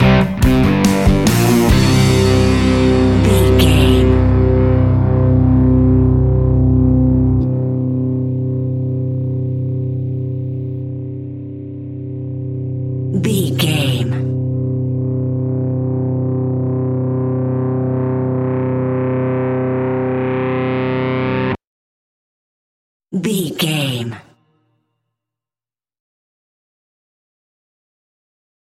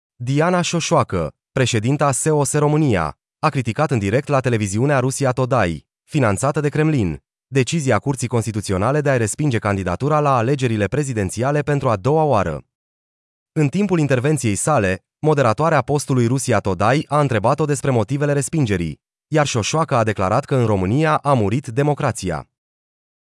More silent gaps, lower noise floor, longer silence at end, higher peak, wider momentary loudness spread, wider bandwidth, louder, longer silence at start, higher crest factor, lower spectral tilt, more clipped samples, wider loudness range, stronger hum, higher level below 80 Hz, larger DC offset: first, 21.67-23.00 s vs 12.75-13.46 s; about the same, under -90 dBFS vs under -90 dBFS; first, 4.5 s vs 0.85 s; first, 0 dBFS vs -4 dBFS; first, 11 LU vs 6 LU; first, 16 kHz vs 12 kHz; first, -15 LUFS vs -19 LUFS; second, 0 s vs 0.2 s; about the same, 16 dB vs 14 dB; about the same, -7 dB/octave vs -6 dB/octave; neither; first, 11 LU vs 2 LU; neither; first, -26 dBFS vs -50 dBFS; neither